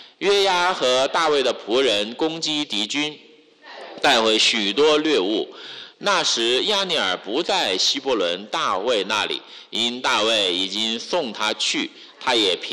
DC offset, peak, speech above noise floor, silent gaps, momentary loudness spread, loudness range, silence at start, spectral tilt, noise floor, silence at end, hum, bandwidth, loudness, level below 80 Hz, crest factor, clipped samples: under 0.1%; -8 dBFS; 24 dB; none; 9 LU; 2 LU; 0 s; -1.5 dB/octave; -45 dBFS; 0 s; none; 13.5 kHz; -20 LUFS; -64 dBFS; 14 dB; under 0.1%